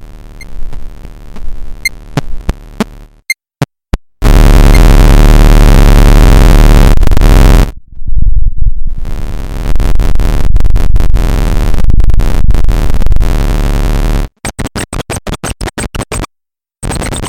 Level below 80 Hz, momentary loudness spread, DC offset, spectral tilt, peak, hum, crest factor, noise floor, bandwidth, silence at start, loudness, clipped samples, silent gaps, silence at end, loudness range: -8 dBFS; 16 LU; under 0.1%; -5.5 dB/octave; 0 dBFS; none; 6 dB; -72 dBFS; 16.5 kHz; 0 s; -11 LUFS; 0.3%; none; 0 s; 12 LU